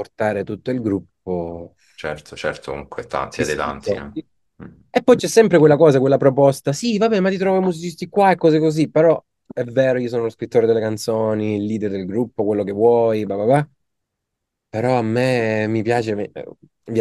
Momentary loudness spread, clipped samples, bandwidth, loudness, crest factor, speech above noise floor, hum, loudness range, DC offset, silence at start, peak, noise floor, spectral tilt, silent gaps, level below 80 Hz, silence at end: 15 LU; under 0.1%; 12.5 kHz; -18 LUFS; 18 dB; 61 dB; none; 10 LU; under 0.1%; 0 s; 0 dBFS; -79 dBFS; -6.5 dB/octave; none; -54 dBFS; 0 s